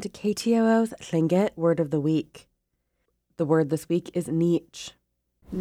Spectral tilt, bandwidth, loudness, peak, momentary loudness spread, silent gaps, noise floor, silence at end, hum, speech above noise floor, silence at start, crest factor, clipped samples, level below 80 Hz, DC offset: -7 dB/octave; 15.5 kHz; -25 LUFS; -10 dBFS; 14 LU; none; -76 dBFS; 0 s; 60 Hz at -55 dBFS; 52 dB; 0 s; 16 dB; under 0.1%; -62 dBFS; under 0.1%